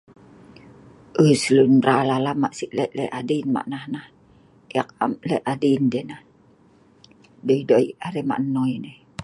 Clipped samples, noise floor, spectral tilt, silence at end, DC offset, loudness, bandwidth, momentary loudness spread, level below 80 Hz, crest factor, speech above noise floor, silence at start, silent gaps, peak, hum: under 0.1%; -55 dBFS; -6.5 dB/octave; 0 s; under 0.1%; -21 LUFS; 11.5 kHz; 15 LU; -64 dBFS; 20 dB; 34 dB; 1.15 s; none; -4 dBFS; none